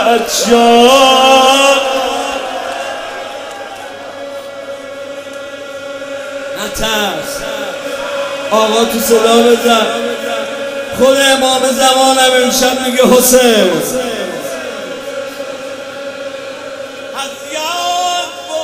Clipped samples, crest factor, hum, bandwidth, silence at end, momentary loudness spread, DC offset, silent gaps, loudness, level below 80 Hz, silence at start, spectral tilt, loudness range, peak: 0.3%; 12 dB; none; 16.5 kHz; 0 s; 19 LU; under 0.1%; none; -11 LUFS; -44 dBFS; 0 s; -2 dB/octave; 14 LU; 0 dBFS